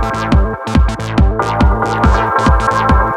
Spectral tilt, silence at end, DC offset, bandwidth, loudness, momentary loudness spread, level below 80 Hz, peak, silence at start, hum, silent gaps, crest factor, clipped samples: -7 dB/octave; 0 s; under 0.1%; 10.5 kHz; -13 LUFS; 3 LU; -16 dBFS; 0 dBFS; 0 s; none; none; 12 dB; under 0.1%